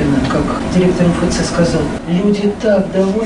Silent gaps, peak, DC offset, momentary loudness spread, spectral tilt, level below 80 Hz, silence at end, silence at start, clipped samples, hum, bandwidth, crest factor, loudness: none; -2 dBFS; under 0.1%; 3 LU; -6.5 dB/octave; -30 dBFS; 0 s; 0 s; under 0.1%; none; 11 kHz; 10 dB; -14 LUFS